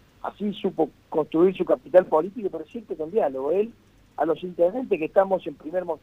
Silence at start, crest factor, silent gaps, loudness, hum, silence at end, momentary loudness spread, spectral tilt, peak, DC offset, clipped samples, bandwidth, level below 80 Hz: 0.25 s; 20 dB; none; -24 LUFS; none; 0.05 s; 12 LU; -8.5 dB/octave; -4 dBFS; under 0.1%; under 0.1%; 5.6 kHz; -62 dBFS